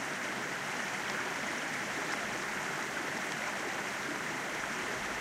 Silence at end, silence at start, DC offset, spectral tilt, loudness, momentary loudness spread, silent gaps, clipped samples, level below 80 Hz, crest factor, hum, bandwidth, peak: 0 s; 0 s; under 0.1%; -2 dB/octave; -35 LUFS; 1 LU; none; under 0.1%; -68 dBFS; 18 dB; none; 16 kHz; -18 dBFS